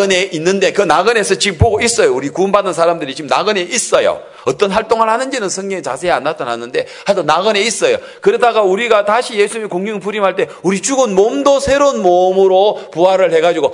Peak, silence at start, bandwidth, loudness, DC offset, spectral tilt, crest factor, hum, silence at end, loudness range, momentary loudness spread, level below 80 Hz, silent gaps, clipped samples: 0 dBFS; 0 s; 11 kHz; -13 LUFS; under 0.1%; -3.5 dB/octave; 14 dB; none; 0 s; 3 LU; 8 LU; -40 dBFS; none; 0.2%